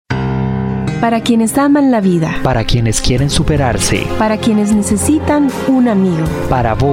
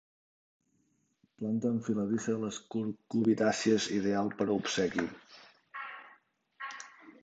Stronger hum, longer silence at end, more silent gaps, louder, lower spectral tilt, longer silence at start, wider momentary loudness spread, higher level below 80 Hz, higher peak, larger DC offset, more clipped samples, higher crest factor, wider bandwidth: neither; about the same, 0 s vs 0.1 s; neither; first, -13 LUFS vs -32 LUFS; about the same, -5.5 dB/octave vs -5 dB/octave; second, 0.1 s vs 1.4 s; second, 5 LU vs 17 LU; first, -26 dBFS vs -70 dBFS; first, -2 dBFS vs -14 dBFS; neither; neither; second, 10 dB vs 20 dB; first, 16.5 kHz vs 9 kHz